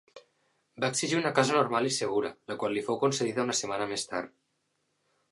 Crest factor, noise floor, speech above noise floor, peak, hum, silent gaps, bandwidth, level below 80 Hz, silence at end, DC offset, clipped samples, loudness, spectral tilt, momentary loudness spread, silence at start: 24 dB; -77 dBFS; 48 dB; -6 dBFS; none; none; 11.5 kHz; -72 dBFS; 1.05 s; under 0.1%; under 0.1%; -29 LUFS; -3.5 dB/octave; 9 LU; 0.15 s